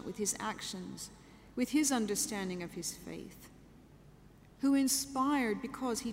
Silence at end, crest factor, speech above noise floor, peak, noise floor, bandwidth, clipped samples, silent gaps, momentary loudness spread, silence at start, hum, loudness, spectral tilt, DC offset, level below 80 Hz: 0 s; 18 dB; 24 dB; -18 dBFS; -59 dBFS; 16 kHz; under 0.1%; none; 16 LU; 0 s; none; -34 LUFS; -3 dB/octave; under 0.1%; -64 dBFS